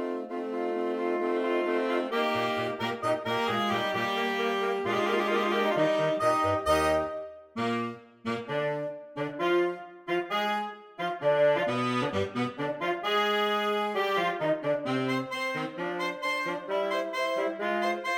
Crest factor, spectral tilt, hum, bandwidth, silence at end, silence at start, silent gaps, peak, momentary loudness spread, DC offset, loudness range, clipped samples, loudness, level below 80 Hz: 14 dB; -5 dB/octave; none; 17 kHz; 0 s; 0 s; none; -14 dBFS; 8 LU; under 0.1%; 4 LU; under 0.1%; -29 LUFS; -62 dBFS